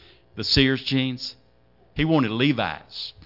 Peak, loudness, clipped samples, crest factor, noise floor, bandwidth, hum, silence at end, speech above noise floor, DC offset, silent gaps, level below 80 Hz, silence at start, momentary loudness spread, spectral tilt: -6 dBFS; -22 LUFS; under 0.1%; 18 dB; -59 dBFS; 5.8 kHz; none; 0.15 s; 36 dB; under 0.1%; none; -44 dBFS; 0.35 s; 15 LU; -6 dB/octave